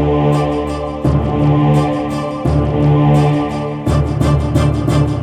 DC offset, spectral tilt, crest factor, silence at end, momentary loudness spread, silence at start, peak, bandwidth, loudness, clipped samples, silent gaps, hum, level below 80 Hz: under 0.1%; -8 dB/octave; 12 dB; 0 s; 7 LU; 0 s; 0 dBFS; 10 kHz; -15 LUFS; under 0.1%; none; none; -24 dBFS